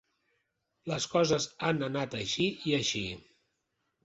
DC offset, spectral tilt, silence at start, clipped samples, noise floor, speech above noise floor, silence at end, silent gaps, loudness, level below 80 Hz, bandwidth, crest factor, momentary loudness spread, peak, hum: under 0.1%; -4 dB/octave; 0.85 s; under 0.1%; -81 dBFS; 50 dB; 0.85 s; none; -31 LUFS; -64 dBFS; 8.2 kHz; 20 dB; 10 LU; -14 dBFS; none